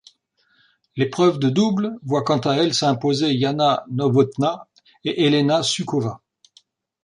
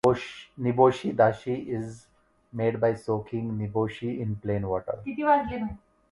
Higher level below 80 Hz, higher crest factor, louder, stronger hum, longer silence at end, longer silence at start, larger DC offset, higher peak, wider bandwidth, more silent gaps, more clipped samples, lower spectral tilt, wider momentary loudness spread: second, -62 dBFS vs -54 dBFS; about the same, 16 dB vs 20 dB; first, -20 LUFS vs -27 LUFS; neither; first, 0.9 s vs 0.35 s; first, 0.95 s vs 0.05 s; neither; about the same, -4 dBFS vs -6 dBFS; about the same, 11 kHz vs 11.5 kHz; neither; neither; second, -5.5 dB/octave vs -7.5 dB/octave; second, 9 LU vs 12 LU